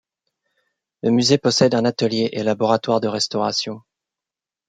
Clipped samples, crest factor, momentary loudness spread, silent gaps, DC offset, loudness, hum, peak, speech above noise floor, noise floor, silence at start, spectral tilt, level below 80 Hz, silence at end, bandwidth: under 0.1%; 18 dB; 8 LU; none; under 0.1%; -19 LUFS; none; -2 dBFS; 70 dB; -89 dBFS; 1.05 s; -4.5 dB/octave; -64 dBFS; 0.9 s; 9.4 kHz